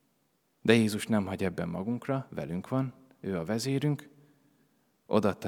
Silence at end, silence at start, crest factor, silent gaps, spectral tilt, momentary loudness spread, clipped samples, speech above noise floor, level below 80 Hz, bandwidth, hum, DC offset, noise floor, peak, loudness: 0 s; 0.65 s; 24 dB; none; -6 dB/octave; 12 LU; under 0.1%; 44 dB; -70 dBFS; 17.5 kHz; none; under 0.1%; -73 dBFS; -6 dBFS; -31 LUFS